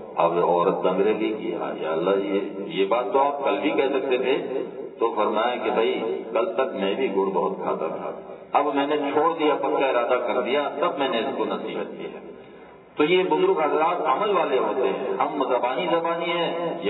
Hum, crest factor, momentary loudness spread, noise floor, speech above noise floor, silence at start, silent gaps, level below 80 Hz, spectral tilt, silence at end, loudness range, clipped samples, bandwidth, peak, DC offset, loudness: none; 18 dB; 8 LU; -46 dBFS; 23 dB; 0 s; none; -74 dBFS; -9 dB/octave; 0 s; 2 LU; under 0.1%; 4.1 kHz; -6 dBFS; under 0.1%; -23 LUFS